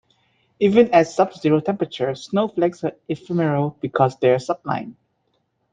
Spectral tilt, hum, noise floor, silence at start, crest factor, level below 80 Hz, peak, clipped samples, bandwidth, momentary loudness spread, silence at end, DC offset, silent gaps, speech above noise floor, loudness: -7 dB/octave; none; -69 dBFS; 0.6 s; 20 dB; -62 dBFS; -2 dBFS; under 0.1%; 9.2 kHz; 11 LU; 0.8 s; under 0.1%; none; 50 dB; -20 LUFS